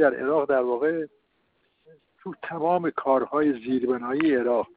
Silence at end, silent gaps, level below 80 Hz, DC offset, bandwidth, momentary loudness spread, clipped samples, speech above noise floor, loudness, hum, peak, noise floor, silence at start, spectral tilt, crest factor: 0.1 s; none; -68 dBFS; under 0.1%; 4.7 kHz; 14 LU; under 0.1%; 46 dB; -24 LUFS; none; -6 dBFS; -70 dBFS; 0 s; -10.5 dB/octave; 18 dB